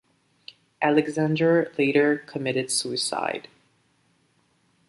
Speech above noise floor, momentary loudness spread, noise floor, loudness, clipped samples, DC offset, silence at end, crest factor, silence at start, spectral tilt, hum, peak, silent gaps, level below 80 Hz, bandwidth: 43 dB; 7 LU; -66 dBFS; -23 LUFS; under 0.1%; under 0.1%; 1.5 s; 18 dB; 0.8 s; -4.5 dB/octave; none; -6 dBFS; none; -72 dBFS; 11.5 kHz